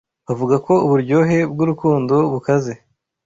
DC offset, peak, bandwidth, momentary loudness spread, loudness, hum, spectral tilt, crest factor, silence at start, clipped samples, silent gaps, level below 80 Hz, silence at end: under 0.1%; -4 dBFS; 7.8 kHz; 9 LU; -17 LUFS; none; -8.5 dB/octave; 14 dB; 0.3 s; under 0.1%; none; -54 dBFS; 0.5 s